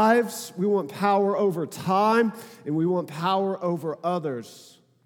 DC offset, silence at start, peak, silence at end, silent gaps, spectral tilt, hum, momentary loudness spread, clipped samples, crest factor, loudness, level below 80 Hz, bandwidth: under 0.1%; 0 s; -6 dBFS; 0.45 s; none; -6 dB/octave; none; 10 LU; under 0.1%; 18 dB; -25 LUFS; -80 dBFS; 18.5 kHz